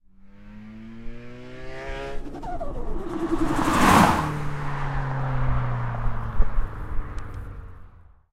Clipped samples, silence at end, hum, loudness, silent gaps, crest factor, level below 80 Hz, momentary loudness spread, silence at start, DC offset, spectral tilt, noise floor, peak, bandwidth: under 0.1%; 0.45 s; none; -25 LUFS; none; 22 dB; -30 dBFS; 23 LU; 0.25 s; under 0.1%; -5.5 dB/octave; -48 dBFS; -2 dBFS; 15.5 kHz